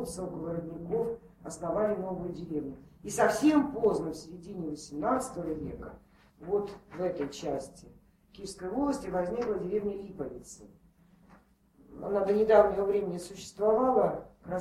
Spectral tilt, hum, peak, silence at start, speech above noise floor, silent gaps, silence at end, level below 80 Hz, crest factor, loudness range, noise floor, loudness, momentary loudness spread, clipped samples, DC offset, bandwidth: -6 dB/octave; none; -10 dBFS; 0 s; 32 dB; none; 0 s; -58 dBFS; 22 dB; 8 LU; -62 dBFS; -31 LUFS; 18 LU; under 0.1%; under 0.1%; 15 kHz